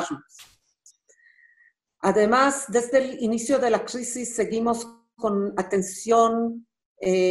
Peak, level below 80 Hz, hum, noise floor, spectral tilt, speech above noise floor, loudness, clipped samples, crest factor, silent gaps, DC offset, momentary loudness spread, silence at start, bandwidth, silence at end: -6 dBFS; -62 dBFS; none; -62 dBFS; -4.5 dB/octave; 39 dB; -23 LUFS; under 0.1%; 18 dB; 6.86-6.96 s; under 0.1%; 11 LU; 0 s; 12.5 kHz; 0 s